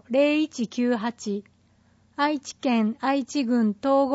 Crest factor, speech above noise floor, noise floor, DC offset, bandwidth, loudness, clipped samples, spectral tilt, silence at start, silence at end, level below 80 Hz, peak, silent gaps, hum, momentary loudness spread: 16 dB; 37 dB; -61 dBFS; under 0.1%; 8 kHz; -25 LUFS; under 0.1%; -5 dB/octave; 0.1 s; 0 s; -70 dBFS; -10 dBFS; none; none; 9 LU